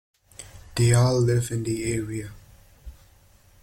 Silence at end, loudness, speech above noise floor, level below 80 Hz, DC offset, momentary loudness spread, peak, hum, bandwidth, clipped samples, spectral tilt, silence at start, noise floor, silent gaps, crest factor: 0.7 s; -24 LUFS; 33 dB; -48 dBFS; under 0.1%; 24 LU; -6 dBFS; none; 15.5 kHz; under 0.1%; -6 dB/octave; 0.4 s; -56 dBFS; none; 20 dB